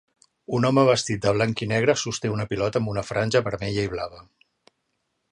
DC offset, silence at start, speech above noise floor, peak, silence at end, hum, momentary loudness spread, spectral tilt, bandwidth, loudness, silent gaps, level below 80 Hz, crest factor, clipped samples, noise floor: under 0.1%; 0.5 s; 52 dB; -4 dBFS; 1.1 s; none; 9 LU; -5 dB/octave; 11 kHz; -23 LUFS; none; -52 dBFS; 20 dB; under 0.1%; -75 dBFS